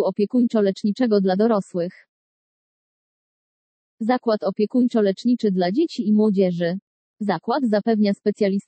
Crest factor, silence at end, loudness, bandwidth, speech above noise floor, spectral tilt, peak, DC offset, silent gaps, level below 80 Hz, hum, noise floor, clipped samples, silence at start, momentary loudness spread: 14 dB; 0.1 s; -21 LUFS; 8.4 kHz; over 70 dB; -8 dB/octave; -8 dBFS; under 0.1%; 2.09-3.98 s, 6.82-7.14 s; -78 dBFS; none; under -90 dBFS; under 0.1%; 0 s; 7 LU